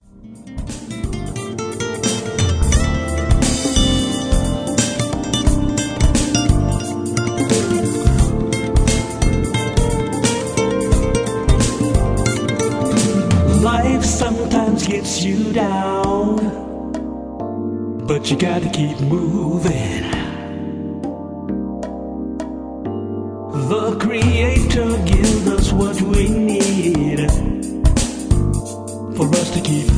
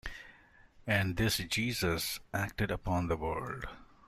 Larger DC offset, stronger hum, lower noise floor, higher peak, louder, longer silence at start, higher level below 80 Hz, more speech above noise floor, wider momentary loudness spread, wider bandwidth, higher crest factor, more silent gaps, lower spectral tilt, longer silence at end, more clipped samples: neither; neither; second, -38 dBFS vs -60 dBFS; first, -2 dBFS vs -14 dBFS; first, -18 LUFS vs -33 LUFS; about the same, 0.15 s vs 0.05 s; first, -24 dBFS vs -50 dBFS; second, 20 dB vs 26 dB; second, 10 LU vs 14 LU; second, 10.5 kHz vs 16 kHz; second, 16 dB vs 22 dB; neither; about the same, -5 dB/octave vs -4.5 dB/octave; second, 0 s vs 0.25 s; neither